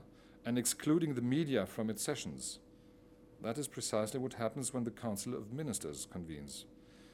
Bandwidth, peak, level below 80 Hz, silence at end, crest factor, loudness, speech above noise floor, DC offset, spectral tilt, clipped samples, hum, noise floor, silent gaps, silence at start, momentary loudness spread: 17 kHz; -20 dBFS; -68 dBFS; 0 s; 20 dB; -38 LUFS; 23 dB; under 0.1%; -4.5 dB/octave; under 0.1%; none; -61 dBFS; none; 0 s; 13 LU